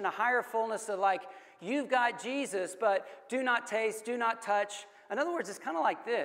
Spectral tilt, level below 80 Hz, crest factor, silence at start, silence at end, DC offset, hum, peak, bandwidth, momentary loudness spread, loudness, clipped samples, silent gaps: -3 dB/octave; under -90 dBFS; 18 dB; 0 s; 0 s; under 0.1%; none; -16 dBFS; 16 kHz; 8 LU; -32 LUFS; under 0.1%; none